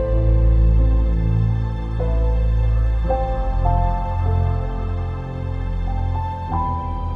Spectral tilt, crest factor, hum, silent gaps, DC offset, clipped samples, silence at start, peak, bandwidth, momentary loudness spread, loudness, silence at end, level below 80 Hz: -10 dB/octave; 12 dB; none; none; under 0.1%; under 0.1%; 0 s; -6 dBFS; 4.3 kHz; 8 LU; -21 LUFS; 0 s; -20 dBFS